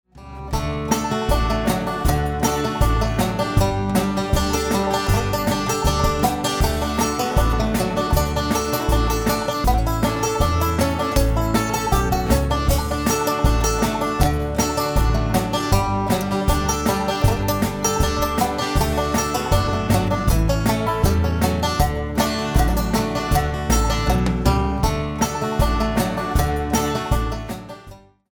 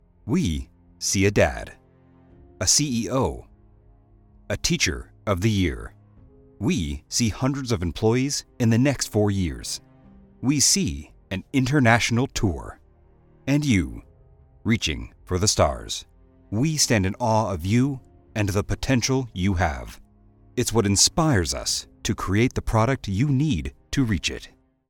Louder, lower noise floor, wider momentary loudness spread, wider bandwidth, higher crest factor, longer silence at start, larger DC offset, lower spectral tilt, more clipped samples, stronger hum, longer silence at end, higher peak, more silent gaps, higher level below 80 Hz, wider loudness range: first, -20 LUFS vs -23 LUFS; second, -43 dBFS vs -55 dBFS; second, 2 LU vs 14 LU; first, over 20 kHz vs 18 kHz; about the same, 16 dB vs 20 dB; about the same, 0.15 s vs 0.25 s; neither; about the same, -5 dB/octave vs -4 dB/octave; neither; neither; about the same, 0.35 s vs 0.45 s; about the same, -2 dBFS vs -4 dBFS; neither; first, -24 dBFS vs -40 dBFS; second, 1 LU vs 4 LU